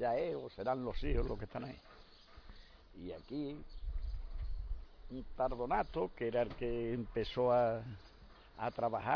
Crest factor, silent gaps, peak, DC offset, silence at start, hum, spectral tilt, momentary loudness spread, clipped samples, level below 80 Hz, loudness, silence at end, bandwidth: 20 dB; none; -20 dBFS; under 0.1%; 0 s; none; -5.5 dB/octave; 22 LU; under 0.1%; -46 dBFS; -39 LUFS; 0 s; 5.4 kHz